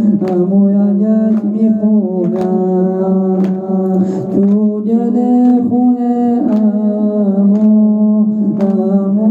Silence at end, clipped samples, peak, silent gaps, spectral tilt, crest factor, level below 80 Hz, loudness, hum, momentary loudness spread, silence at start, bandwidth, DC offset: 0 s; under 0.1%; -2 dBFS; none; -11.5 dB/octave; 8 dB; -60 dBFS; -12 LUFS; none; 4 LU; 0 s; 2.2 kHz; under 0.1%